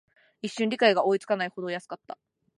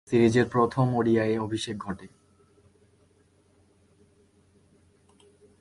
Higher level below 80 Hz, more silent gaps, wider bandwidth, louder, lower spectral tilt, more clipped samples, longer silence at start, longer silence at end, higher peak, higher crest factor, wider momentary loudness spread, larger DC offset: second, -80 dBFS vs -60 dBFS; neither; about the same, 11.5 kHz vs 11.5 kHz; about the same, -26 LUFS vs -25 LUFS; second, -4.5 dB/octave vs -7 dB/octave; neither; first, 0.45 s vs 0.1 s; second, 0.45 s vs 3.55 s; about the same, -6 dBFS vs -8 dBFS; about the same, 22 dB vs 20 dB; first, 19 LU vs 14 LU; neither